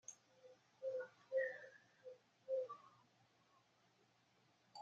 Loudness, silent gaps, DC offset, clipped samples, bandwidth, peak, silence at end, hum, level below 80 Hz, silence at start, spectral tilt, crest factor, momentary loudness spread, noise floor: -47 LUFS; none; under 0.1%; under 0.1%; 7.6 kHz; -32 dBFS; 0 s; none; under -90 dBFS; 0.1 s; -1 dB/octave; 20 dB; 24 LU; -77 dBFS